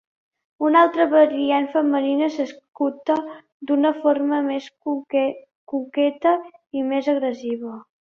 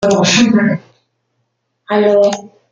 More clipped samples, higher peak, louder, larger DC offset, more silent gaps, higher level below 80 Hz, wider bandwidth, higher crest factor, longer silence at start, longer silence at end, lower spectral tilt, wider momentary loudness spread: neither; second, -4 dBFS vs 0 dBFS; second, -21 LUFS vs -12 LUFS; neither; first, 2.68-2.72 s, 3.52-3.60 s, 5.55-5.67 s vs none; second, -72 dBFS vs -54 dBFS; second, 6.8 kHz vs 9.2 kHz; about the same, 18 dB vs 14 dB; first, 0.6 s vs 0 s; about the same, 0.2 s vs 0.25 s; about the same, -5 dB/octave vs -4.5 dB/octave; about the same, 13 LU vs 11 LU